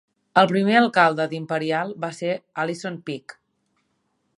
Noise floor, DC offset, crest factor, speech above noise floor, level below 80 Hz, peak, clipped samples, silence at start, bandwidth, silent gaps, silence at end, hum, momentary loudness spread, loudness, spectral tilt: -71 dBFS; under 0.1%; 22 dB; 50 dB; -74 dBFS; 0 dBFS; under 0.1%; 0.35 s; 11.5 kHz; none; 1.05 s; none; 13 LU; -21 LUFS; -5.5 dB/octave